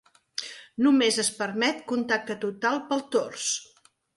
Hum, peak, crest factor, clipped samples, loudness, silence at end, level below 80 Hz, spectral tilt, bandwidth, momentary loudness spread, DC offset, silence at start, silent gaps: none; -12 dBFS; 16 dB; under 0.1%; -26 LUFS; 0.55 s; -74 dBFS; -2.5 dB/octave; 11.5 kHz; 14 LU; under 0.1%; 0.4 s; none